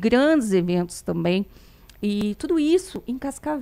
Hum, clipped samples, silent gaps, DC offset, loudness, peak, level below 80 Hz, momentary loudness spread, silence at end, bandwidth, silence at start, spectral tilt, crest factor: none; under 0.1%; none; under 0.1%; -23 LUFS; -6 dBFS; -50 dBFS; 11 LU; 0 s; 15.5 kHz; 0 s; -6 dB/octave; 18 dB